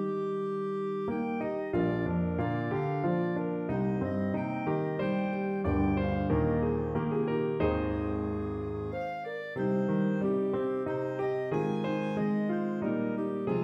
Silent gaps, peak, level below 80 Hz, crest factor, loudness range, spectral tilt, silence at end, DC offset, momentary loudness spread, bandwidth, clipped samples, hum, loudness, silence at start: none; -16 dBFS; -48 dBFS; 16 dB; 2 LU; -9.5 dB/octave; 0 s; under 0.1%; 4 LU; 7 kHz; under 0.1%; none; -31 LUFS; 0 s